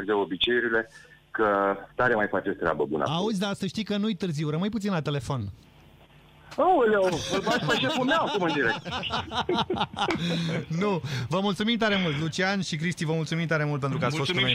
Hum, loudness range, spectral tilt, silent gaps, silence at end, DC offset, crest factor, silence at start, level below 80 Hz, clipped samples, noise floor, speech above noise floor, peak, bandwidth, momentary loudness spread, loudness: none; 3 LU; -5 dB/octave; none; 0 s; under 0.1%; 18 dB; 0 s; -56 dBFS; under 0.1%; -54 dBFS; 28 dB; -10 dBFS; 15.5 kHz; 6 LU; -26 LUFS